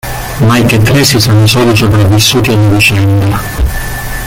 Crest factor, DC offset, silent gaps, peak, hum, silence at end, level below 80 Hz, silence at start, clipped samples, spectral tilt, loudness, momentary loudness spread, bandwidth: 8 dB; under 0.1%; none; 0 dBFS; none; 0 s; -22 dBFS; 0.05 s; 0.1%; -5 dB/octave; -8 LUFS; 8 LU; 17 kHz